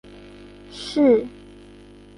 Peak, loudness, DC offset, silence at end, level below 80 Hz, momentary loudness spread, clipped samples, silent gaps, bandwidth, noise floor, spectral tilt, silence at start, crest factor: -6 dBFS; -19 LUFS; under 0.1%; 0.9 s; -52 dBFS; 26 LU; under 0.1%; none; 11 kHz; -46 dBFS; -5.5 dB/octave; 0.75 s; 18 dB